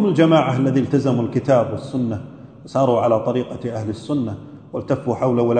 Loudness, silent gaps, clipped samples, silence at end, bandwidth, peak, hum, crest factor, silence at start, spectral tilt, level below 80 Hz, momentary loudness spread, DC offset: -19 LUFS; none; under 0.1%; 0 s; 9.2 kHz; -2 dBFS; none; 16 dB; 0 s; -8 dB/octave; -56 dBFS; 13 LU; under 0.1%